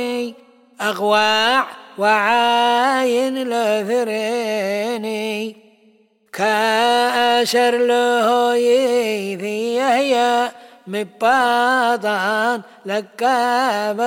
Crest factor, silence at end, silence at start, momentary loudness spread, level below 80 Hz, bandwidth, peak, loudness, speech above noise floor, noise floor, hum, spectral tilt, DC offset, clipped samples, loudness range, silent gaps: 14 dB; 0 s; 0 s; 10 LU; -70 dBFS; 17 kHz; -4 dBFS; -17 LUFS; 38 dB; -55 dBFS; none; -3 dB/octave; under 0.1%; under 0.1%; 4 LU; none